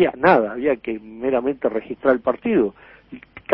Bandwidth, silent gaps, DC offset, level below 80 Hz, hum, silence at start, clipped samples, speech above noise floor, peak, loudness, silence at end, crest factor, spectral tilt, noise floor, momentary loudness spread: 5.6 kHz; none; under 0.1%; -54 dBFS; none; 0 s; under 0.1%; 22 dB; -2 dBFS; -20 LUFS; 0 s; 18 dB; -10 dB/octave; -41 dBFS; 11 LU